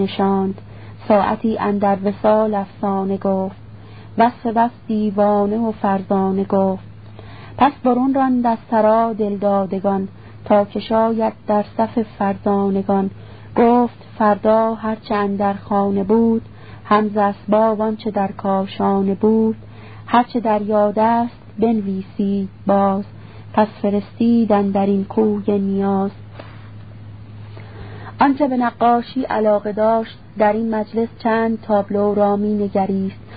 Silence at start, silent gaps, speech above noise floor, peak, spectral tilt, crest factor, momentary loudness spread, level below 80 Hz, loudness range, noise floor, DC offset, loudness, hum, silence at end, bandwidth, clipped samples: 0 s; none; 21 dB; 0 dBFS; -12.5 dB/octave; 18 dB; 17 LU; -50 dBFS; 2 LU; -38 dBFS; 0.5%; -18 LUFS; none; 0 s; 5 kHz; under 0.1%